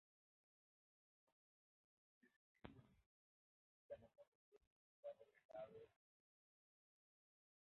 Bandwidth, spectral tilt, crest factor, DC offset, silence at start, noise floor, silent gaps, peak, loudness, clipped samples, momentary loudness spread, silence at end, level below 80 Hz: 4 kHz; -5.5 dB/octave; 30 dB; under 0.1%; 2.25 s; under -90 dBFS; 2.36-2.55 s, 3.06-3.89 s, 4.27-4.52 s, 4.67-5.03 s, 5.45-5.49 s; -38 dBFS; -62 LUFS; under 0.1%; 8 LU; 1.75 s; -88 dBFS